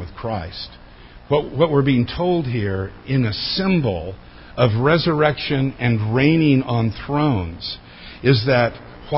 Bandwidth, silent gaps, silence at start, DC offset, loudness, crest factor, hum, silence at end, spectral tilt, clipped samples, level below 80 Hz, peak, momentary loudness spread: 5.8 kHz; none; 0 s; under 0.1%; -19 LUFS; 18 dB; none; 0 s; -11 dB/octave; under 0.1%; -40 dBFS; -2 dBFS; 15 LU